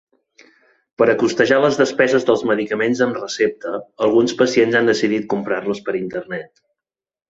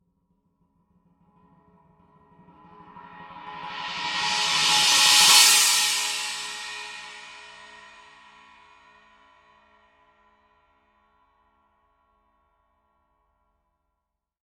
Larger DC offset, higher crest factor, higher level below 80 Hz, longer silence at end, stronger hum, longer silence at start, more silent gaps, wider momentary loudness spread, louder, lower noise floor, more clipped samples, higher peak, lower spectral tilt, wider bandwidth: neither; second, 18 dB vs 24 dB; first, -60 dBFS vs -70 dBFS; second, 0.85 s vs 6.95 s; neither; second, 1 s vs 2.95 s; neither; second, 10 LU vs 28 LU; about the same, -18 LUFS vs -18 LUFS; first, -87 dBFS vs -82 dBFS; neither; about the same, 0 dBFS vs -2 dBFS; first, -5 dB/octave vs 2 dB/octave; second, 8 kHz vs 16.5 kHz